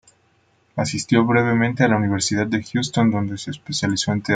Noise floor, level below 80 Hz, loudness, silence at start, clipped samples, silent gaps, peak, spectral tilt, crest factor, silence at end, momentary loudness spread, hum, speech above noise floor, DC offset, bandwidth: -61 dBFS; -56 dBFS; -20 LUFS; 0.75 s; under 0.1%; none; -2 dBFS; -5 dB/octave; 18 dB; 0 s; 9 LU; none; 41 dB; under 0.1%; 9.4 kHz